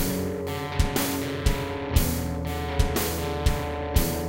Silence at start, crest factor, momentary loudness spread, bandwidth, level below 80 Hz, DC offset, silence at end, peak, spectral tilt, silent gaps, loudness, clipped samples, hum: 0 s; 20 dB; 5 LU; 17 kHz; -30 dBFS; under 0.1%; 0 s; -6 dBFS; -5 dB/octave; none; -27 LUFS; under 0.1%; none